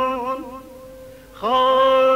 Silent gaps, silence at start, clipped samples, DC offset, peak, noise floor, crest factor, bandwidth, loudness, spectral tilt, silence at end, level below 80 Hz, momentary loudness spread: none; 0 s; under 0.1%; under 0.1%; -8 dBFS; -41 dBFS; 12 dB; 15.5 kHz; -19 LUFS; -4 dB/octave; 0 s; -52 dBFS; 25 LU